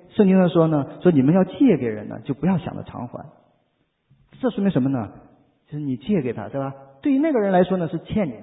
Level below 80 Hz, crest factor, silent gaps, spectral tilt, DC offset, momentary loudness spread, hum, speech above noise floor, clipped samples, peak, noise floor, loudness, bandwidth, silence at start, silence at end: -52 dBFS; 18 dB; none; -13 dB/octave; under 0.1%; 16 LU; none; 48 dB; under 0.1%; -4 dBFS; -69 dBFS; -21 LUFS; 4 kHz; 0.15 s; 0 s